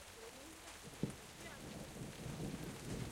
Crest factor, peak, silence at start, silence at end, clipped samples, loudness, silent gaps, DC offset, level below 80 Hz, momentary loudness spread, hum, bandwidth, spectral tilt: 24 dB; -24 dBFS; 0 s; 0 s; under 0.1%; -49 LUFS; none; under 0.1%; -62 dBFS; 7 LU; none; 16 kHz; -4.5 dB/octave